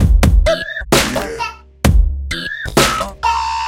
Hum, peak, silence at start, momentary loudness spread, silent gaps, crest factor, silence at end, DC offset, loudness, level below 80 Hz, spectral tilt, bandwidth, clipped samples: none; 0 dBFS; 0 s; 9 LU; none; 14 dB; 0 s; under 0.1%; -16 LUFS; -18 dBFS; -4.5 dB/octave; 17 kHz; under 0.1%